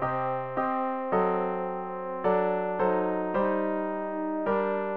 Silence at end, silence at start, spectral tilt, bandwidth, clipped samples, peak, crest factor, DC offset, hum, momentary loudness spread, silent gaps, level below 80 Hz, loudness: 0 s; 0 s; -6.5 dB/octave; 5 kHz; under 0.1%; -14 dBFS; 14 dB; 0.3%; none; 5 LU; none; -64 dBFS; -28 LUFS